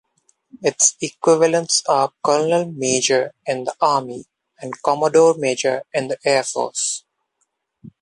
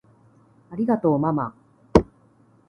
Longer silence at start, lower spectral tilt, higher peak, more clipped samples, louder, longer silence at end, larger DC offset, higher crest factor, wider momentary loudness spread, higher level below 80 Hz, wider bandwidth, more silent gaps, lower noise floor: second, 0.55 s vs 0.7 s; second, -2.5 dB/octave vs -8.5 dB/octave; about the same, 0 dBFS vs 0 dBFS; neither; first, -18 LUFS vs -23 LUFS; second, 0.1 s vs 0.65 s; neither; second, 18 dB vs 24 dB; second, 9 LU vs 15 LU; second, -68 dBFS vs -40 dBFS; first, 11.5 kHz vs 9.6 kHz; neither; first, -72 dBFS vs -57 dBFS